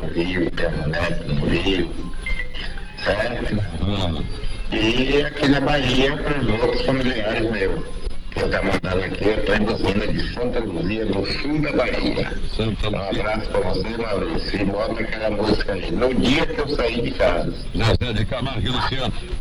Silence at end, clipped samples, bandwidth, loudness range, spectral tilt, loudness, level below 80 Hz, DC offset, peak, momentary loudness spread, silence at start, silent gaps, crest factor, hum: 0 s; under 0.1%; 10.5 kHz; 4 LU; -6 dB/octave; -22 LUFS; -28 dBFS; under 0.1%; -6 dBFS; 8 LU; 0 s; none; 16 dB; none